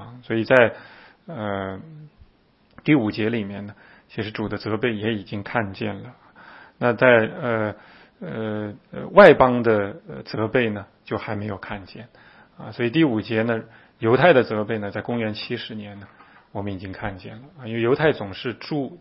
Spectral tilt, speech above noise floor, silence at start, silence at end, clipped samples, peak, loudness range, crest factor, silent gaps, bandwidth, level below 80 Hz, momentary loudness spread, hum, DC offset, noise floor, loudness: -8.5 dB/octave; 37 dB; 0 s; 0.05 s; under 0.1%; 0 dBFS; 8 LU; 22 dB; none; 6 kHz; -54 dBFS; 21 LU; none; under 0.1%; -59 dBFS; -21 LUFS